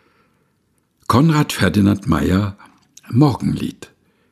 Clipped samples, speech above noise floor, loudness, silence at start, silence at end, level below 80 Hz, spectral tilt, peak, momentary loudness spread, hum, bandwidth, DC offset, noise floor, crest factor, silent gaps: under 0.1%; 48 dB; -17 LUFS; 1.1 s; 0.6 s; -40 dBFS; -6.5 dB/octave; 0 dBFS; 11 LU; none; 14.5 kHz; under 0.1%; -64 dBFS; 18 dB; none